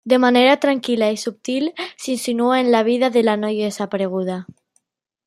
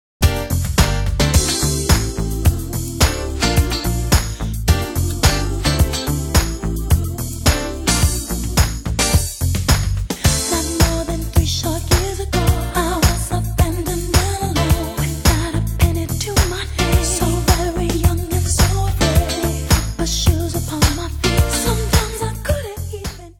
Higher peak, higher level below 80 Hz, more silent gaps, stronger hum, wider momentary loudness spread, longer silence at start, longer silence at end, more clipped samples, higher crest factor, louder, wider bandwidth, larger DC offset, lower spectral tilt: about the same, -2 dBFS vs 0 dBFS; second, -68 dBFS vs -22 dBFS; neither; neither; first, 11 LU vs 5 LU; second, 0.05 s vs 0.2 s; first, 0.85 s vs 0.05 s; neither; about the same, 16 dB vs 18 dB; about the same, -18 LUFS vs -18 LUFS; second, 13.5 kHz vs 17.5 kHz; neither; about the same, -4.5 dB/octave vs -4.5 dB/octave